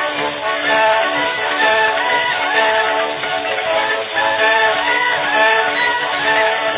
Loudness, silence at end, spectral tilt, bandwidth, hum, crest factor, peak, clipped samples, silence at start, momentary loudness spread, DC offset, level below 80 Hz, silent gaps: -15 LUFS; 0 s; -5.5 dB/octave; 4 kHz; none; 14 dB; -2 dBFS; under 0.1%; 0 s; 6 LU; under 0.1%; -56 dBFS; none